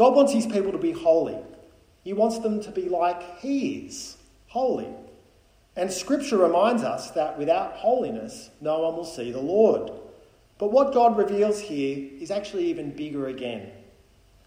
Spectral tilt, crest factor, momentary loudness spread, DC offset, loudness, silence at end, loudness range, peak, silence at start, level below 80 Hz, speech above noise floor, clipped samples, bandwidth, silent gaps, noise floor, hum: -5 dB/octave; 20 dB; 16 LU; under 0.1%; -25 LUFS; 0.65 s; 5 LU; -6 dBFS; 0 s; -60 dBFS; 35 dB; under 0.1%; 16 kHz; none; -58 dBFS; none